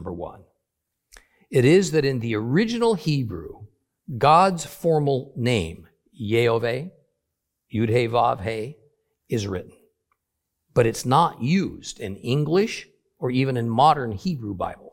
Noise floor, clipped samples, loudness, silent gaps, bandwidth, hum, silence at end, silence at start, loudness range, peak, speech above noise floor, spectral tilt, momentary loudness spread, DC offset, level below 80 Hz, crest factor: -80 dBFS; under 0.1%; -22 LUFS; none; 16.5 kHz; none; 0.05 s; 0 s; 4 LU; -4 dBFS; 59 dB; -6 dB/octave; 16 LU; under 0.1%; -54 dBFS; 20 dB